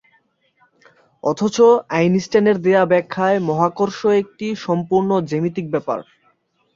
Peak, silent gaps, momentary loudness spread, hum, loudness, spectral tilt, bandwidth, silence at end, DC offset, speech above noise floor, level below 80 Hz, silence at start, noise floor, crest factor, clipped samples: -2 dBFS; none; 10 LU; none; -18 LUFS; -6.5 dB/octave; 7.6 kHz; 0.75 s; under 0.1%; 45 dB; -60 dBFS; 1.25 s; -62 dBFS; 16 dB; under 0.1%